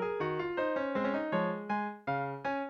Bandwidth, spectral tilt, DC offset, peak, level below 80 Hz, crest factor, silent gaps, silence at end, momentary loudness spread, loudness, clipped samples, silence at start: 6.6 kHz; -8 dB/octave; under 0.1%; -20 dBFS; -68 dBFS; 14 dB; none; 0 s; 3 LU; -34 LUFS; under 0.1%; 0 s